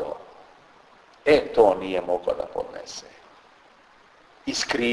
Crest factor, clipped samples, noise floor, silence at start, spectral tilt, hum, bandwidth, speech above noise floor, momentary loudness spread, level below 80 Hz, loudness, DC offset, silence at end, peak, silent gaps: 22 dB; under 0.1%; -55 dBFS; 0 s; -3.5 dB/octave; none; 11 kHz; 32 dB; 18 LU; -56 dBFS; -24 LUFS; under 0.1%; 0 s; -4 dBFS; none